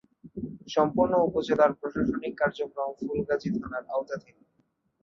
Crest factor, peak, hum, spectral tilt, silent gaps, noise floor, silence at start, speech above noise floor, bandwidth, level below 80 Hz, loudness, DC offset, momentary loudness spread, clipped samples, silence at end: 20 dB; -8 dBFS; none; -6.5 dB/octave; none; -72 dBFS; 0.25 s; 45 dB; 7.2 kHz; -56 dBFS; -28 LUFS; under 0.1%; 15 LU; under 0.1%; 0.85 s